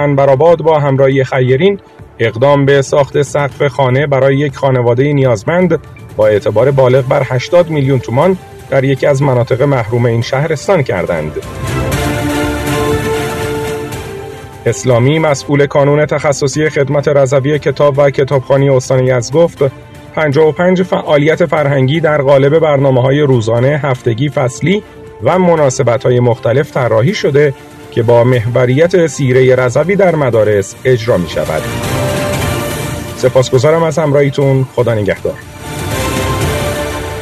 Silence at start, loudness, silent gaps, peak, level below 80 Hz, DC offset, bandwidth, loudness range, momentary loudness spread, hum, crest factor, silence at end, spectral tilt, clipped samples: 0 s; -11 LUFS; none; 0 dBFS; -36 dBFS; under 0.1%; 14 kHz; 4 LU; 8 LU; none; 10 dB; 0 s; -6.5 dB/octave; 0.2%